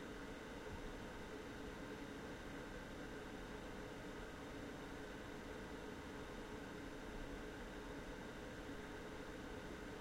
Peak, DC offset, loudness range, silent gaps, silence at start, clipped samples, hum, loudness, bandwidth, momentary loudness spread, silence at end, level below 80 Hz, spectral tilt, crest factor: -38 dBFS; under 0.1%; 0 LU; none; 0 s; under 0.1%; none; -52 LUFS; 16 kHz; 1 LU; 0 s; -60 dBFS; -5 dB/octave; 14 dB